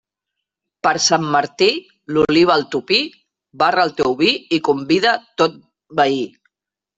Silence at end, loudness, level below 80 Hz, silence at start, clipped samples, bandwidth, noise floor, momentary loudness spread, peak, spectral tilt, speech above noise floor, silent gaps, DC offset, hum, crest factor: 0.7 s; -17 LUFS; -56 dBFS; 0.85 s; under 0.1%; 8.2 kHz; -84 dBFS; 8 LU; 0 dBFS; -3.5 dB/octave; 67 dB; none; under 0.1%; none; 18 dB